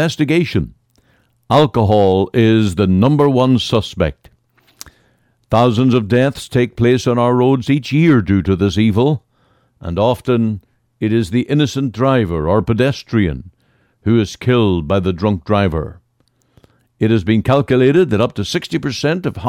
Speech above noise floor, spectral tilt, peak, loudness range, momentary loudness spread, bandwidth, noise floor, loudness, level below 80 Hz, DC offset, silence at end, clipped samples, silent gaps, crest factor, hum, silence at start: 46 dB; -7 dB/octave; -2 dBFS; 4 LU; 8 LU; 14.5 kHz; -60 dBFS; -15 LUFS; -38 dBFS; under 0.1%; 0 s; under 0.1%; none; 12 dB; none; 0 s